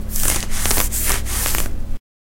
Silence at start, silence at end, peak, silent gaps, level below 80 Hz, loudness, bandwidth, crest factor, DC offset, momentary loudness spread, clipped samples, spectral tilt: 0 s; 0.25 s; 0 dBFS; none; -22 dBFS; -19 LUFS; 17.5 kHz; 18 dB; under 0.1%; 11 LU; under 0.1%; -2 dB/octave